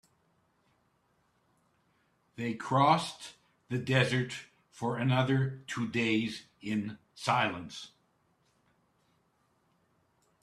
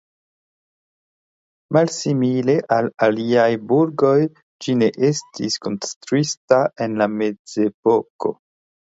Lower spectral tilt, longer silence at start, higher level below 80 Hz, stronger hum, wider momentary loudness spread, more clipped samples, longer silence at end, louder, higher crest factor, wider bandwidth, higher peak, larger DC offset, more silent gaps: about the same, -5.5 dB/octave vs -5.5 dB/octave; first, 2.4 s vs 1.7 s; about the same, -70 dBFS vs -66 dBFS; neither; first, 16 LU vs 8 LU; neither; first, 2.55 s vs 0.6 s; second, -31 LUFS vs -19 LUFS; first, 24 dB vs 18 dB; first, 12 kHz vs 8 kHz; second, -10 dBFS vs -2 dBFS; neither; second, none vs 4.42-4.59 s, 5.96-6.01 s, 6.37-6.48 s, 7.39-7.45 s, 7.74-7.83 s, 8.10-8.19 s